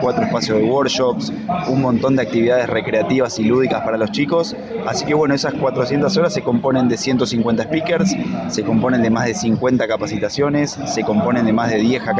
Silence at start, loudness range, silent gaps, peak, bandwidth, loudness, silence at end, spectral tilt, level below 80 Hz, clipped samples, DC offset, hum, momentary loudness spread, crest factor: 0 s; 1 LU; none; -2 dBFS; 9.4 kHz; -17 LUFS; 0 s; -5.5 dB/octave; -50 dBFS; under 0.1%; under 0.1%; none; 5 LU; 14 dB